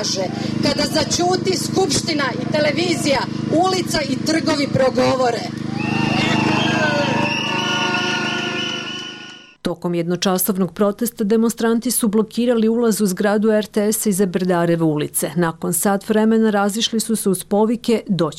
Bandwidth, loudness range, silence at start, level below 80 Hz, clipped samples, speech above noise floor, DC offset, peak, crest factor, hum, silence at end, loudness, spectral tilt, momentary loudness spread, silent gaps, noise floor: 16 kHz; 3 LU; 0 s; -50 dBFS; under 0.1%; 20 dB; under 0.1%; -8 dBFS; 12 dB; none; 0 s; -18 LUFS; -4.5 dB/octave; 5 LU; none; -38 dBFS